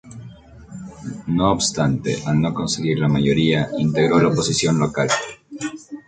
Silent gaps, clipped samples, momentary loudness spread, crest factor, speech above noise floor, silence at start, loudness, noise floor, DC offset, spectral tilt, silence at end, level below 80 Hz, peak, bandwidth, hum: none; under 0.1%; 17 LU; 18 dB; 22 dB; 0.05 s; -19 LUFS; -41 dBFS; under 0.1%; -5 dB/octave; 0.05 s; -46 dBFS; -2 dBFS; 9.4 kHz; none